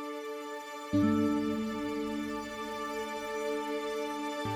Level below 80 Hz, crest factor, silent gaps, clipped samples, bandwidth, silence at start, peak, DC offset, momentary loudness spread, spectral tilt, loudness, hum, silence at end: -62 dBFS; 16 dB; none; under 0.1%; 18.5 kHz; 0 s; -16 dBFS; under 0.1%; 11 LU; -5.5 dB/octave; -34 LUFS; none; 0 s